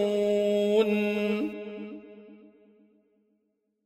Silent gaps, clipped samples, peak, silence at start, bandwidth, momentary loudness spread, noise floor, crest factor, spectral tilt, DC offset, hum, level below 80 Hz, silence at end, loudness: none; under 0.1%; -12 dBFS; 0 s; 14 kHz; 17 LU; -76 dBFS; 16 dB; -6.5 dB/octave; under 0.1%; none; -70 dBFS; 1.5 s; -26 LUFS